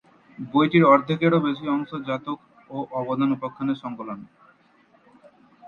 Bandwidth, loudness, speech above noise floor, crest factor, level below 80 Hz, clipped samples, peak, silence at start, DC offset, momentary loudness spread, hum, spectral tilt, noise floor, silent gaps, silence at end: 6.8 kHz; -23 LUFS; 36 dB; 20 dB; -66 dBFS; under 0.1%; -4 dBFS; 0.4 s; under 0.1%; 19 LU; none; -9 dB/octave; -59 dBFS; none; 0 s